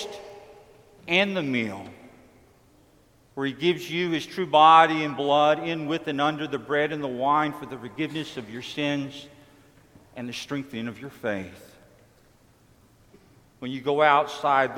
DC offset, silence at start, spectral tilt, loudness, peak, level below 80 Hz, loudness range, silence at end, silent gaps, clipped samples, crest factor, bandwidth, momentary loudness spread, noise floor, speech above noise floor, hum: under 0.1%; 0 s; -5 dB/octave; -24 LUFS; -4 dBFS; -66 dBFS; 15 LU; 0 s; none; under 0.1%; 22 dB; 16 kHz; 18 LU; -59 dBFS; 34 dB; none